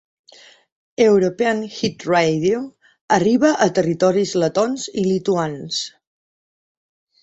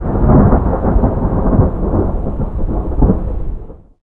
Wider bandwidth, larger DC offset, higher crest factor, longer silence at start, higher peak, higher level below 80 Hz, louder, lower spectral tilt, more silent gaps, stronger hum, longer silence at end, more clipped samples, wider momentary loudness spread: first, 8.2 kHz vs 2.5 kHz; neither; first, 18 dB vs 12 dB; first, 1 s vs 0 s; about the same, 0 dBFS vs 0 dBFS; second, -60 dBFS vs -18 dBFS; second, -18 LUFS vs -15 LUFS; second, -5 dB/octave vs -13 dB/octave; first, 3.01-3.08 s vs none; neither; first, 1.35 s vs 0.25 s; neither; about the same, 10 LU vs 12 LU